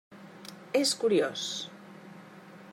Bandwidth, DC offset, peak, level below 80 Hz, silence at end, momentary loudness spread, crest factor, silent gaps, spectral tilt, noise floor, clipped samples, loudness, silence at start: 16 kHz; under 0.1%; -14 dBFS; -86 dBFS; 0 s; 23 LU; 18 dB; none; -3 dB/octave; -50 dBFS; under 0.1%; -29 LUFS; 0.1 s